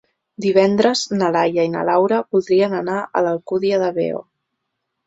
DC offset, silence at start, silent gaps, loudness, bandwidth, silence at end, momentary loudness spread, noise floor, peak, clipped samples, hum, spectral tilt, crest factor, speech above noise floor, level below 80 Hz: under 0.1%; 0.4 s; none; -18 LUFS; 8 kHz; 0.85 s; 7 LU; -76 dBFS; -2 dBFS; under 0.1%; none; -5.5 dB/octave; 16 dB; 59 dB; -62 dBFS